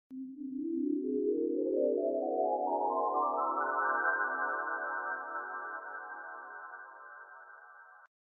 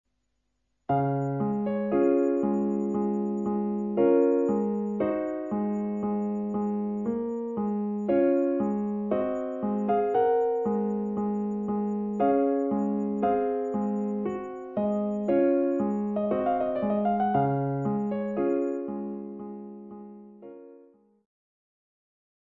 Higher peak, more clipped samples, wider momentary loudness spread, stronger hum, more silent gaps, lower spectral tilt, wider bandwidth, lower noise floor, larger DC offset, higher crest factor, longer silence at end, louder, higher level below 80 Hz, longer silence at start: second, -18 dBFS vs -12 dBFS; neither; first, 19 LU vs 9 LU; neither; neither; second, 4.5 dB/octave vs -10 dB/octave; second, 2.2 kHz vs 7.2 kHz; second, -55 dBFS vs -77 dBFS; neither; about the same, 16 dB vs 16 dB; second, 0.15 s vs 1.7 s; second, -34 LUFS vs -27 LUFS; second, -88 dBFS vs -66 dBFS; second, 0.1 s vs 0.9 s